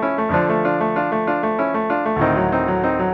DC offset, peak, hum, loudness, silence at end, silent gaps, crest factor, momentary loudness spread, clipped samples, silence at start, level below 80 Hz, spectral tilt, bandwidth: under 0.1%; -4 dBFS; none; -19 LUFS; 0 s; none; 14 dB; 2 LU; under 0.1%; 0 s; -42 dBFS; -9.5 dB/octave; 6.2 kHz